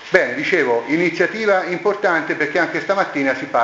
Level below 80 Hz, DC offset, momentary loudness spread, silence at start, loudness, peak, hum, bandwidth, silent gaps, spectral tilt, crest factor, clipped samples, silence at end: -62 dBFS; under 0.1%; 3 LU; 0 s; -18 LUFS; 0 dBFS; none; 8 kHz; none; -5 dB/octave; 18 dB; under 0.1%; 0 s